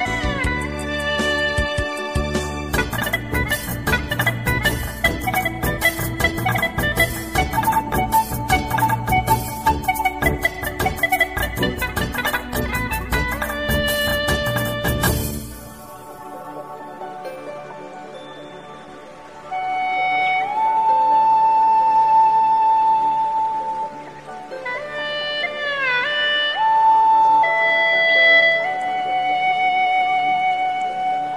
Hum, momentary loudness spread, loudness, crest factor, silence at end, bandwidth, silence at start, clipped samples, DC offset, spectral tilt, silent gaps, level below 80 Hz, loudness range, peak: none; 19 LU; -19 LUFS; 16 dB; 0 s; 16 kHz; 0 s; under 0.1%; 0.2%; -4 dB/octave; none; -34 dBFS; 10 LU; -4 dBFS